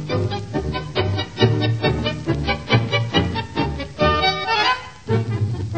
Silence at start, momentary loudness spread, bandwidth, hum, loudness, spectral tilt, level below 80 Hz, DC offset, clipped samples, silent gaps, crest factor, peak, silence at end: 0 s; 6 LU; 8.8 kHz; none; -21 LUFS; -6 dB/octave; -38 dBFS; 0.5%; under 0.1%; none; 18 dB; -2 dBFS; 0 s